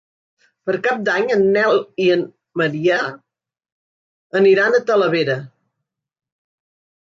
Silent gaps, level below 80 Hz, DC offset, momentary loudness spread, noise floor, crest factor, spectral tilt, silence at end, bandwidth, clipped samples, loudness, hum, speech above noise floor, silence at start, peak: 3.72-4.30 s; -68 dBFS; under 0.1%; 10 LU; -79 dBFS; 16 dB; -6 dB/octave; 1.7 s; 7.4 kHz; under 0.1%; -17 LUFS; none; 63 dB; 0.65 s; -4 dBFS